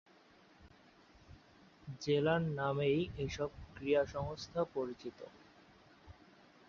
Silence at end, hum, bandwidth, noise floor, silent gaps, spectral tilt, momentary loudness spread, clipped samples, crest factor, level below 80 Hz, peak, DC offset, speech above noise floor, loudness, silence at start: 0.55 s; none; 7.4 kHz; -64 dBFS; none; -5.5 dB/octave; 17 LU; under 0.1%; 20 dB; -60 dBFS; -20 dBFS; under 0.1%; 28 dB; -37 LUFS; 0.6 s